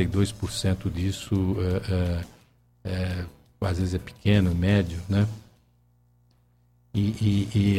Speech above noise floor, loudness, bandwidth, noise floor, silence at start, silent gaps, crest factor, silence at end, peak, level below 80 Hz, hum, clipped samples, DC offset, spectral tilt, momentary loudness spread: 38 dB; -26 LUFS; 13.5 kHz; -62 dBFS; 0 s; none; 18 dB; 0 s; -8 dBFS; -42 dBFS; 60 Hz at -50 dBFS; under 0.1%; under 0.1%; -6.5 dB/octave; 11 LU